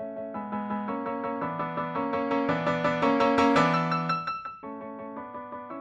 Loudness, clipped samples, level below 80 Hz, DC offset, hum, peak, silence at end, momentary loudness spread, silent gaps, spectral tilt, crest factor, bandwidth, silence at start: -27 LUFS; under 0.1%; -62 dBFS; under 0.1%; none; -10 dBFS; 0 s; 17 LU; none; -6.5 dB/octave; 18 dB; 9.2 kHz; 0 s